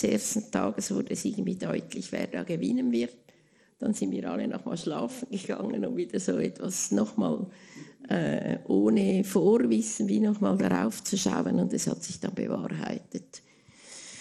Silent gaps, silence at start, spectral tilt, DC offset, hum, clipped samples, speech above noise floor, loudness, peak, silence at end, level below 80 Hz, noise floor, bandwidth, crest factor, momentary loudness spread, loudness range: none; 0 s; -5.5 dB/octave; under 0.1%; none; under 0.1%; 34 dB; -29 LUFS; -10 dBFS; 0 s; -68 dBFS; -63 dBFS; 13 kHz; 18 dB; 12 LU; 6 LU